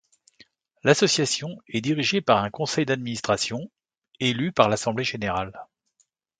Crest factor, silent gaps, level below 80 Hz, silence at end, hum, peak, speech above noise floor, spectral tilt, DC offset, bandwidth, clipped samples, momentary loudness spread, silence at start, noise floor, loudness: 24 dB; 3.98-4.02 s; -58 dBFS; 0.75 s; none; -2 dBFS; 46 dB; -4 dB/octave; under 0.1%; 9.6 kHz; under 0.1%; 10 LU; 0.85 s; -70 dBFS; -24 LUFS